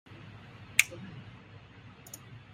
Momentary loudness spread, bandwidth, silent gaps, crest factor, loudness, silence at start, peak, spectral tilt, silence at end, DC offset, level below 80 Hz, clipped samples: 25 LU; 16 kHz; none; 38 dB; -28 LUFS; 0.05 s; 0 dBFS; -1 dB/octave; 0 s; under 0.1%; -66 dBFS; under 0.1%